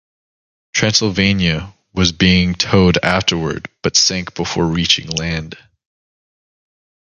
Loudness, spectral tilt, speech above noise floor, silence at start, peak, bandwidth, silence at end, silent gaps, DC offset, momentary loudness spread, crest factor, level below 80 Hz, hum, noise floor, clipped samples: -15 LUFS; -4 dB/octave; over 74 dB; 0.75 s; 0 dBFS; 7.8 kHz; 1.65 s; none; under 0.1%; 10 LU; 18 dB; -36 dBFS; none; under -90 dBFS; under 0.1%